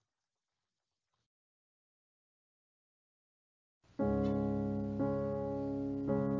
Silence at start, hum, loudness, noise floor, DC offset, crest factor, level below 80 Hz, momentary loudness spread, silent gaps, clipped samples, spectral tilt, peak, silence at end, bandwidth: 4 s; none; -36 LUFS; under -90 dBFS; under 0.1%; 18 dB; -58 dBFS; 4 LU; none; under 0.1%; -10 dB/octave; -22 dBFS; 0 s; 6.8 kHz